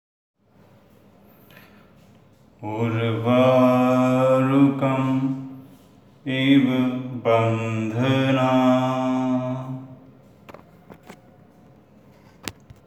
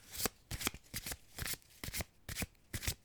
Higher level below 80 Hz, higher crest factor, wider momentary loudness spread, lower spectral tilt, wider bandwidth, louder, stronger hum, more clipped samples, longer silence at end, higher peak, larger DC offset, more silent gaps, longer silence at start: second, -66 dBFS vs -52 dBFS; second, 16 dB vs 30 dB; first, 18 LU vs 5 LU; first, -7.5 dB/octave vs -2.5 dB/octave; second, 12.5 kHz vs over 20 kHz; first, -20 LUFS vs -42 LUFS; neither; neither; first, 0.35 s vs 0.1 s; first, -6 dBFS vs -14 dBFS; neither; neither; first, 2.6 s vs 0 s